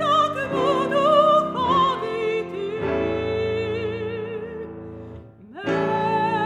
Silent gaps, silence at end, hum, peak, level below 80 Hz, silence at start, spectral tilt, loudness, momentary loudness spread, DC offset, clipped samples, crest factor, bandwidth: none; 0 s; none; -4 dBFS; -50 dBFS; 0 s; -6 dB/octave; -22 LUFS; 17 LU; under 0.1%; under 0.1%; 18 dB; 11 kHz